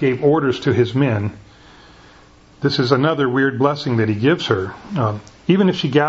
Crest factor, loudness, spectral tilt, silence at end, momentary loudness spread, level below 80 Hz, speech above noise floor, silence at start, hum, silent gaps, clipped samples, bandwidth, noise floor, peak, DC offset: 18 dB; -18 LUFS; -7 dB/octave; 0 s; 7 LU; -52 dBFS; 30 dB; 0 s; none; none; under 0.1%; 8 kHz; -47 dBFS; 0 dBFS; under 0.1%